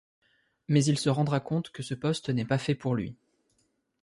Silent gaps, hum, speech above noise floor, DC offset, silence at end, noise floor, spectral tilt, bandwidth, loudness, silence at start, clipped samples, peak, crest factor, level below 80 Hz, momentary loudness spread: none; none; 46 dB; under 0.1%; 0.9 s; -74 dBFS; -6 dB/octave; 11.5 kHz; -29 LUFS; 0.7 s; under 0.1%; -12 dBFS; 18 dB; -62 dBFS; 9 LU